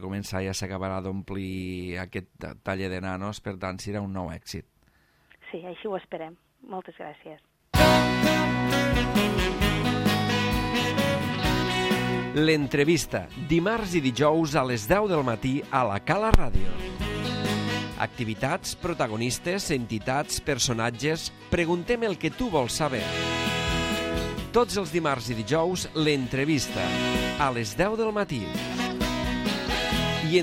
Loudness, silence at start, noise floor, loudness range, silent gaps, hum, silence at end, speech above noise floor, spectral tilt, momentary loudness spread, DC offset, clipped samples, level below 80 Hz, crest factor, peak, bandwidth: -26 LUFS; 0 s; -63 dBFS; 10 LU; none; none; 0 s; 37 dB; -4.5 dB/octave; 11 LU; under 0.1%; under 0.1%; -38 dBFS; 26 dB; 0 dBFS; 16 kHz